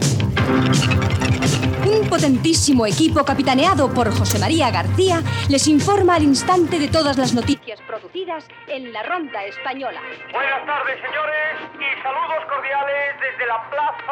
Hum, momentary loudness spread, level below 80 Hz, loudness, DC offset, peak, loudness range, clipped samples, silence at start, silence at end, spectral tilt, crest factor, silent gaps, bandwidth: none; 12 LU; -42 dBFS; -18 LUFS; under 0.1%; -4 dBFS; 8 LU; under 0.1%; 0 s; 0 s; -5 dB/octave; 14 dB; none; 19 kHz